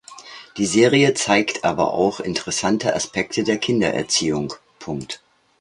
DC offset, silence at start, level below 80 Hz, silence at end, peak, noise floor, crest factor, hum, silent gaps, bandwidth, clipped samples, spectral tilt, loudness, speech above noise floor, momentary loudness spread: under 0.1%; 0.1 s; -54 dBFS; 0.45 s; -2 dBFS; -41 dBFS; 20 dB; none; none; 11.5 kHz; under 0.1%; -4 dB/octave; -20 LUFS; 21 dB; 17 LU